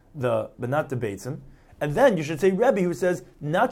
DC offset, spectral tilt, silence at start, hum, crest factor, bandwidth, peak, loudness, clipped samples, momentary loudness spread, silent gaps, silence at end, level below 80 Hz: under 0.1%; -6.5 dB/octave; 0.15 s; none; 16 dB; 16 kHz; -8 dBFS; -24 LUFS; under 0.1%; 11 LU; none; 0 s; -54 dBFS